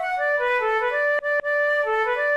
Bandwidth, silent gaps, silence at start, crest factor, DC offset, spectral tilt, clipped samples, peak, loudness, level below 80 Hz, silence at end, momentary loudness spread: 12.5 kHz; none; 0 s; 10 dB; under 0.1%; -1.5 dB/octave; under 0.1%; -12 dBFS; -22 LUFS; -58 dBFS; 0 s; 1 LU